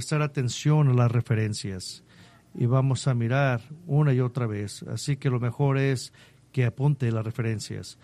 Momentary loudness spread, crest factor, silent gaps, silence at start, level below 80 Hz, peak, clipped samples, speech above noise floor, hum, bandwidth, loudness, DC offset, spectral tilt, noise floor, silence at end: 12 LU; 16 dB; none; 0 s; -60 dBFS; -10 dBFS; under 0.1%; 28 dB; none; 12.5 kHz; -26 LUFS; under 0.1%; -6.5 dB/octave; -53 dBFS; 0.1 s